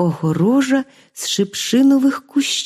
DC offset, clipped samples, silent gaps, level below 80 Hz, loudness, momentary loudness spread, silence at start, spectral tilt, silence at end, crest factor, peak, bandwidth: under 0.1%; under 0.1%; none; -64 dBFS; -17 LUFS; 8 LU; 0 s; -4.5 dB/octave; 0 s; 12 dB; -4 dBFS; 14.5 kHz